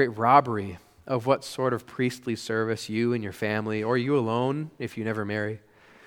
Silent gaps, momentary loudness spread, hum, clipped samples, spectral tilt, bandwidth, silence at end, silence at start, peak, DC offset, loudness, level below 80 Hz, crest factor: none; 12 LU; none; under 0.1%; -6.5 dB/octave; 18 kHz; 0.5 s; 0 s; -4 dBFS; under 0.1%; -27 LUFS; -66 dBFS; 24 dB